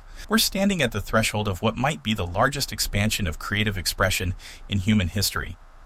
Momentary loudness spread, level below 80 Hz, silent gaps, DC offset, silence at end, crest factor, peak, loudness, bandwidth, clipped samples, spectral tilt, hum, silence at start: 5 LU; -38 dBFS; none; under 0.1%; 0 s; 18 dB; -6 dBFS; -24 LUFS; 16.5 kHz; under 0.1%; -4 dB/octave; none; 0 s